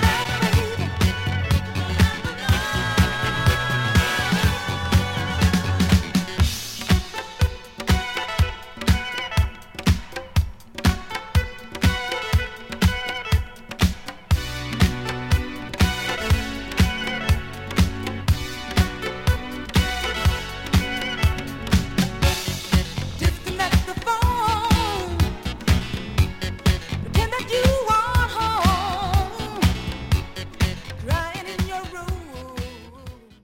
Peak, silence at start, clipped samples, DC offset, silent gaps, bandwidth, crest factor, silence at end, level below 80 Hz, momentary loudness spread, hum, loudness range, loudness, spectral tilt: -2 dBFS; 0 s; under 0.1%; under 0.1%; none; 16.5 kHz; 20 dB; 0.3 s; -28 dBFS; 8 LU; none; 3 LU; -23 LUFS; -5 dB/octave